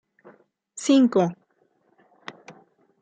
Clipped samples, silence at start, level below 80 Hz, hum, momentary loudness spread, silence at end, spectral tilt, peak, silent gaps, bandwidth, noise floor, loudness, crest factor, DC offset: under 0.1%; 0.75 s; -76 dBFS; none; 25 LU; 0.5 s; -5.5 dB/octave; -8 dBFS; none; 9.4 kHz; -66 dBFS; -21 LUFS; 18 dB; under 0.1%